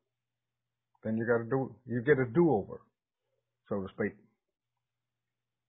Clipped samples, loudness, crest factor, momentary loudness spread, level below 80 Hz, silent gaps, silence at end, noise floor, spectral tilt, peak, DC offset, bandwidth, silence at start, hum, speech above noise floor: under 0.1%; -31 LUFS; 22 dB; 13 LU; -66 dBFS; none; 1.55 s; under -90 dBFS; -11.5 dB/octave; -14 dBFS; under 0.1%; 3.9 kHz; 1.05 s; none; over 60 dB